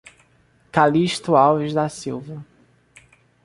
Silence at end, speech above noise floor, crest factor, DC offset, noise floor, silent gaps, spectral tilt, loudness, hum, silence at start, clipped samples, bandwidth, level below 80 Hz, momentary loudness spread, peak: 1 s; 40 dB; 20 dB; under 0.1%; -58 dBFS; none; -6 dB/octave; -19 LUFS; none; 0.75 s; under 0.1%; 11.5 kHz; -58 dBFS; 17 LU; -2 dBFS